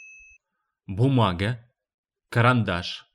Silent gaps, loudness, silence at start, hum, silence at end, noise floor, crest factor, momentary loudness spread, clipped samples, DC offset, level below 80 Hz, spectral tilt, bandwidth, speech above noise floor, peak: 1.94-2.04 s; -23 LUFS; 0 s; none; 0.15 s; -79 dBFS; 18 dB; 11 LU; under 0.1%; under 0.1%; -54 dBFS; -7 dB/octave; 11 kHz; 57 dB; -6 dBFS